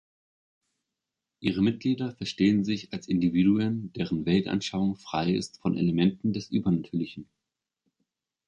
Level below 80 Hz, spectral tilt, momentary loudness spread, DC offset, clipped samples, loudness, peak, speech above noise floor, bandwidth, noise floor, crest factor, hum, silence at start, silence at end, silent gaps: -56 dBFS; -7 dB/octave; 9 LU; under 0.1%; under 0.1%; -27 LUFS; -10 dBFS; 60 dB; 10 kHz; -87 dBFS; 18 dB; none; 1.4 s; 1.25 s; none